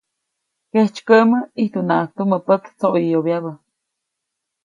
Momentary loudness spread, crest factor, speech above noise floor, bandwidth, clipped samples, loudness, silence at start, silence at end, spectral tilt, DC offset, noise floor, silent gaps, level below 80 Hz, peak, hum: 9 LU; 16 dB; 63 dB; 7.4 kHz; under 0.1%; -18 LUFS; 0.75 s; 1.1 s; -7.5 dB/octave; under 0.1%; -79 dBFS; none; -70 dBFS; -2 dBFS; none